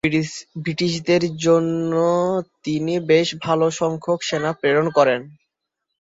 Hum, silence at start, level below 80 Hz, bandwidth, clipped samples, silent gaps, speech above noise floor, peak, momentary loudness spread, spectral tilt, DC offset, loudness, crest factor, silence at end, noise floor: none; 0.05 s; -58 dBFS; 7.8 kHz; under 0.1%; none; 60 dB; -2 dBFS; 8 LU; -5.5 dB/octave; under 0.1%; -20 LUFS; 18 dB; 0.8 s; -80 dBFS